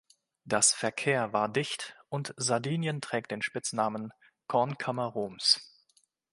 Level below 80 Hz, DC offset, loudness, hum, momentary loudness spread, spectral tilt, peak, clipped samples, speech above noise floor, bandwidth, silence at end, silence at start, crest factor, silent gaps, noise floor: -74 dBFS; under 0.1%; -30 LUFS; none; 12 LU; -3 dB/octave; -8 dBFS; under 0.1%; 40 dB; 11.5 kHz; 0.65 s; 0.45 s; 24 dB; none; -70 dBFS